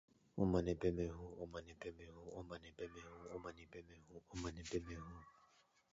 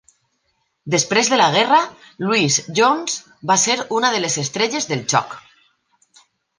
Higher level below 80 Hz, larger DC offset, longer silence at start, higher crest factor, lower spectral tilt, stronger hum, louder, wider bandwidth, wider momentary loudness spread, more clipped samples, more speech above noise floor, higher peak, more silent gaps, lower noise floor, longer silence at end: first, -60 dBFS vs -66 dBFS; neither; second, 0.35 s vs 0.85 s; about the same, 22 dB vs 18 dB; first, -7 dB/octave vs -2.5 dB/octave; neither; second, -46 LUFS vs -17 LUFS; second, 7.6 kHz vs 11 kHz; first, 20 LU vs 12 LU; neither; second, 29 dB vs 51 dB; second, -24 dBFS vs -2 dBFS; neither; first, -74 dBFS vs -69 dBFS; second, 0.6 s vs 1.2 s